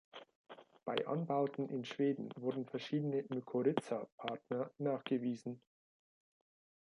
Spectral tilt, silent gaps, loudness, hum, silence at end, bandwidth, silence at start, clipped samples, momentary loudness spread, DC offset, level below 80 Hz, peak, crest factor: -7 dB/octave; 0.35-0.44 s, 4.12-4.18 s; -40 LUFS; none; 1.25 s; 11 kHz; 0.15 s; under 0.1%; 15 LU; under 0.1%; -88 dBFS; -20 dBFS; 20 dB